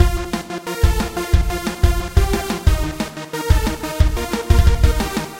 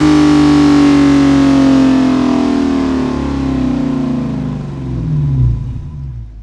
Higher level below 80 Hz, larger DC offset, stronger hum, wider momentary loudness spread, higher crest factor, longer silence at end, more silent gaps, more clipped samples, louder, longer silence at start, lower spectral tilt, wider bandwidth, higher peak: first, -18 dBFS vs -26 dBFS; neither; neither; second, 9 LU vs 13 LU; first, 16 dB vs 10 dB; about the same, 0 s vs 0 s; neither; neither; second, -19 LUFS vs -12 LUFS; about the same, 0 s vs 0 s; second, -5.5 dB/octave vs -7 dB/octave; first, 16.5 kHz vs 10 kHz; about the same, 0 dBFS vs 0 dBFS